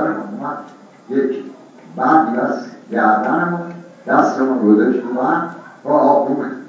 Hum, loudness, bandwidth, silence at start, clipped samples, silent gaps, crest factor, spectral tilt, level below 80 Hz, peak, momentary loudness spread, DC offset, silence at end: none; -17 LUFS; 7.6 kHz; 0 s; under 0.1%; none; 16 dB; -8 dB/octave; -72 dBFS; 0 dBFS; 15 LU; under 0.1%; 0 s